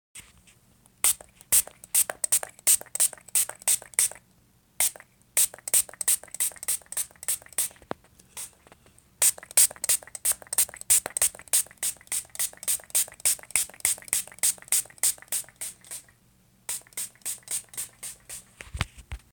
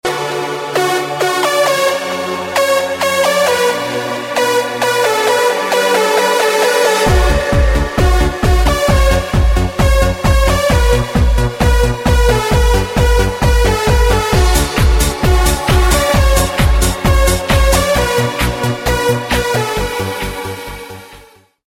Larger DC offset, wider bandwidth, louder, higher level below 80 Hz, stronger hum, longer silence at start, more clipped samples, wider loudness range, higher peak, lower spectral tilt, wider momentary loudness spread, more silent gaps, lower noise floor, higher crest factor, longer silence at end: neither; first, over 20 kHz vs 16.5 kHz; second, -25 LUFS vs -13 LUFS; second, -54 dBFS vs -16 dBFS; neither; about the same, 0.15 s vs 0.05 s; neither; first, 8 LU vs 2 LU; about the same, -2 dBFS vs 0 dBFS; second, 1 dB/octave vs -4.5 dB/octave; first, 18 LU vs 6 LU; neither; first, -62 dBFS vs -43 dBFS; first, 26 dB vs 12 dB; second, 0.15 s vs 0.45 s